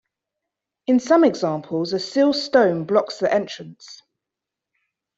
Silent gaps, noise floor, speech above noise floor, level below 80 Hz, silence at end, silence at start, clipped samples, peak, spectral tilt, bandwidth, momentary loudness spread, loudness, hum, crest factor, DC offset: none; -86 dBFS; 66 dB; -68 dBFS; 1.25 s; 0.9 s; under 0.1%; -4 dBFS; -5.5 dB/octave; 8 kHz; 15 LU; -20 LUFS; none; 18 dB; under 0.1%